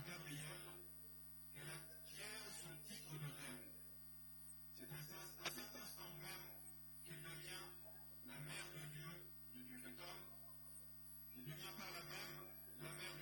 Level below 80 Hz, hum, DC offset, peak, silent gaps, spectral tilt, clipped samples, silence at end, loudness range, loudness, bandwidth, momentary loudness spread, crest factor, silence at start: -74 dBFS; 50 Hz at -65 dBFS; under 0.1%; -34 dBFS; none; -3 dB/octave; under 0.1%; 0 s; 1 LU; -53 LUFS; 17.5 kHz; 5 LU; 22 dB; 0 s